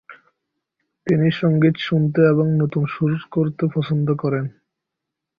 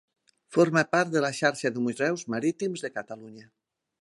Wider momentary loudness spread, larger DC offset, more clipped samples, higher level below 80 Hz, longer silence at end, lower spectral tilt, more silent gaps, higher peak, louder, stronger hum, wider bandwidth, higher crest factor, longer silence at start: second, 7 LU vs 13 LU; neither; neither; first, -58 dBFS vs -76 dBFS; first, 0.9 s vs 0.6 s; first, -9.5 dB/octave vs -5 dB/octave; neither; first, -2 dBFS vs -8 dBFS; first, -19 LUFS vs -26 LUFS; neither; second, 5.2 kHz vs 11.5 kHz; about the same, 18 dB vs 20 dB; second, 0.1 s vs 0.5 s